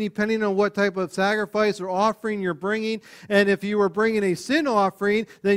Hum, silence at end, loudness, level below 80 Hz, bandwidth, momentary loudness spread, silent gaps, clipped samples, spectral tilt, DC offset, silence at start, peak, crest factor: none; 0 s; -23 LUFS; -62 dBFS; 15 kHz; 6 LU; none; under 0.1%; -5.5 dB/octave; under 0.1%; 0 s; -6 dBFS; 16 dB